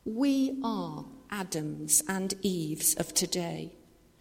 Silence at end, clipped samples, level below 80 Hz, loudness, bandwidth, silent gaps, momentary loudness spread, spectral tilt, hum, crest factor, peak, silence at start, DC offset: 0.45 s; under 0.1%; -62 dBFS; -29 LUFS; 16.5 kHz; none; 14 LU; -3 dB/octave; none; 20 dB; -10 dBFS; 0.05 s; under 0.1%